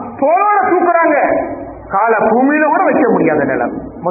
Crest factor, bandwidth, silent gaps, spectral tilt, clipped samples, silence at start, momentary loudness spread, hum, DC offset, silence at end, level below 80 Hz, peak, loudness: 12 dB; 2.7 kHz; none; -16 dB/octave; under 0.1%; 0 s; 9 LU; none; under 0.1%; 0 s; -46 dBFS; 0 dBFS; -12 LUFS